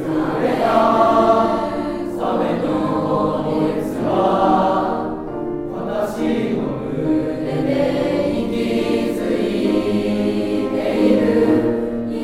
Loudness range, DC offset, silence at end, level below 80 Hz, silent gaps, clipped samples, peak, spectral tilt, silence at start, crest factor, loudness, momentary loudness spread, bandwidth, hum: 3 LU; under 0.1%; 0 s; -42 dBFS; none; under 0.1%; -2 dBFS; -7 dB/octave; 0 s; 16 dB; -19 LUFS; 8 LU; 15 kHz; none